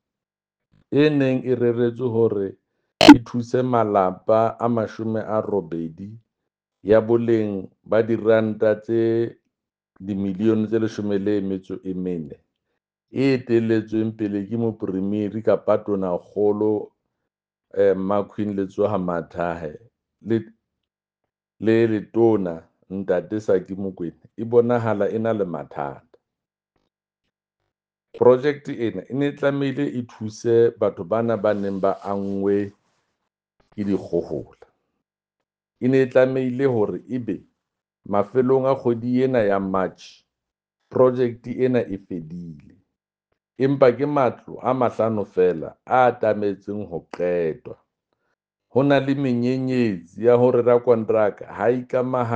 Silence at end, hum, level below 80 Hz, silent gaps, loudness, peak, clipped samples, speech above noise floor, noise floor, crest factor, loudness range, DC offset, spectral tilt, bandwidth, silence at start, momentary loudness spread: 0 s; none; -60 dBFS; none; -21 LUFS; 0 dBFS; under 0.1%; 68 dB; -89 dBFS; 22 dB; 7 LU; under 0.1%; -7 dB/octave; 9.4 kHz; 0.9 s; 13 LU